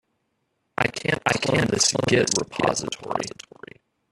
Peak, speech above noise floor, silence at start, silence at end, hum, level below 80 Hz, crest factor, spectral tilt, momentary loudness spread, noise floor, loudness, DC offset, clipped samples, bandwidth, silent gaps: -2 dBFS; 51 dB; 0.8 s; 0.8 s; none; -54 dBFS; 22 dB; -3 dB/octave; 15 LU; -74 dBFS; -22 LUFS; under 0.1%; under 0.1%; 13.5 kHz; none